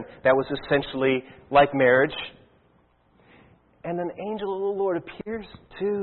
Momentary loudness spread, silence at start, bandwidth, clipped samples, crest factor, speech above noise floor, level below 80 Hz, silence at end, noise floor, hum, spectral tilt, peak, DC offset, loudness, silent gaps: 16 LU; 0 s; 4.3 kHz; under 0.1%; 20 dB; 38 dB; -56 dBFS; 0 s; -62 dBFS; none; -10 dB/octave; -6 dBFS; under 0.1%; -24 LUFS; none